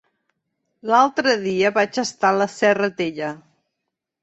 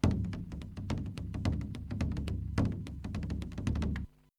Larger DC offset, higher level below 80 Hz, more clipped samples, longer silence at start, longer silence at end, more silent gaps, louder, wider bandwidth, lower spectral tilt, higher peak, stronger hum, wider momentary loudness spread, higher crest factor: neither; second, -66 dBFS vs -42 dBFS; neither; first, 0.85 s vs 0.05 s; first, 0.85 s vs 0.3 s; neither; first, -19 LUFS vs -37 LUFS; second, 8.2 kHz vs 11.5 kHz; second, -4 dB/octave vs -7.5 dB/octave; first, -2 dBFS vs -12 dBFS; neither; first, 13 LU vs 7 LU; about the same, 18 dB vs 22 dB